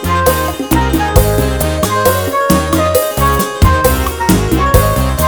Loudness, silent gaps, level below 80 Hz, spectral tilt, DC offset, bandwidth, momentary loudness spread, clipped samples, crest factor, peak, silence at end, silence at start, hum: -12 LUFS; none; -18 dBFS; -5 dB/octave; 0.6%; over 20 kHz; 3 LU; 0.3%; 12 dB; 0 dBFS; 0 s; 0 s; none